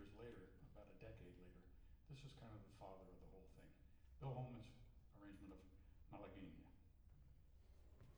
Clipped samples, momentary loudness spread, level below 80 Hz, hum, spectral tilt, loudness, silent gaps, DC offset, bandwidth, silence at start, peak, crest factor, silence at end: under 0.1%; 14 LU; -68 dBFS; none; -7.5 dB/octave; -61 LUFS; none; under 0.1%; over 20 kHz; 0 s; -40 dBFS; 20 dB; 0 s